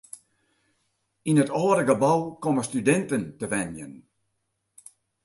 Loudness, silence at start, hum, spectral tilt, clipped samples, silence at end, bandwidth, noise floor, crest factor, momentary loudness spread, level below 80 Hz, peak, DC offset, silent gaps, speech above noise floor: -24 LUFS; 1.25 s; none; -6 dB/octave; under 0.1%; 1.25 s; 11.5 kHz; -77 dBFS; 20 dB; 18 LU; -64 dBFS; -8 dBFS; under 0.1%; none; 53 dB